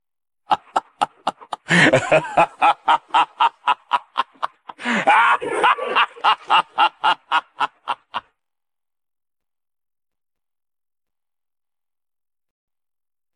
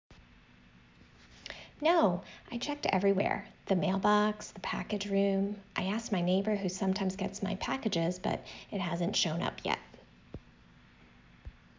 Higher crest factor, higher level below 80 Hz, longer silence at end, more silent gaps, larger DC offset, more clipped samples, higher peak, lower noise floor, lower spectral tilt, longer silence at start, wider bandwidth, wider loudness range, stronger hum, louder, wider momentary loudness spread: about the same, 20 dB vs 20 dB; about the same, -64 dBFS vs -60 dBFS; first, 5.15 s vs 0.3 s; neither; neither; neither; first, -2 dBFS vs -14 dBFS; first, under -90 dBFS vs -59 dBFS; about the same, -4 dB/octave vs -5 dB/octave; first, 0.5 s vs 0.1 s; first, 11 kHz vs 7.6 kHz; first, 10 LU vs 4 LU; neither; first, -18 LUFS vs -32 LUFS; about the same, 14 LU vs 12 LU